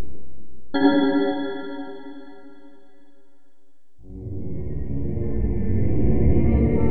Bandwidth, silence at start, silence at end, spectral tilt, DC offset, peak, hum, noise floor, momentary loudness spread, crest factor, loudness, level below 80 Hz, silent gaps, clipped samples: 4.6 kHz; 0 s; 0 s; -10.5 dB/octave; under 0.1%; -4 dBFS; none; -68 dBFS; 19 LU; 16 dB; -23 LUFS; -30 dBFS; none; under 0.1%